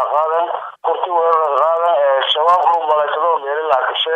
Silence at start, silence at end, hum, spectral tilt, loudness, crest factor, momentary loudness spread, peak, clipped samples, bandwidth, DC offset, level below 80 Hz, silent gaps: 0 s; 0 s; none; -2 dB/octave; -15 LUFS; 12 dB; 6 LU; -2 dBFS; under 0.1%; 8.4 kHz; under 0.1%; -68 dBFS; none